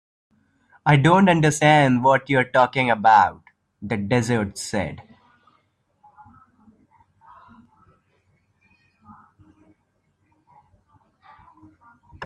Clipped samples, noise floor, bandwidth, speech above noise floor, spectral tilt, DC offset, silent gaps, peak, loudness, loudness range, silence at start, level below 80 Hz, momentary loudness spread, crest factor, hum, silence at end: under 0.1%; -69 dBFS; 12.5 kHz; 51 dB; -5.5 dB/octave; under 0.1%; none; -2 dBFS; -19 LUFS; 15 LU; 0.85 s; -58 dBFS; 13 LU; 20 dB; none; 0 s